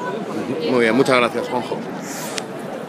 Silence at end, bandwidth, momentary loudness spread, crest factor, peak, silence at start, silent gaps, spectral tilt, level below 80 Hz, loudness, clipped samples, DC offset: 0 s; 15.5 kHz; 12 LU; 20 dB; 0 dBFS; 0 s; none; -4.5 dB/octave; -70 dBFS; -20 LUFS; under 0.1%; under 0.1%